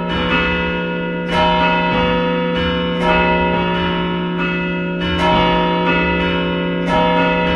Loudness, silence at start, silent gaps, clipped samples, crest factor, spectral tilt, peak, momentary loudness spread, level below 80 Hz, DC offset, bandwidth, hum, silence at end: -16 LUFS; 0 s; none; under 0.1%; 14 dB; -7 dB/octave; -2 dBFS; 5 LU; -32 dBFS; under 0.1%; 7 kHz; none; 0 s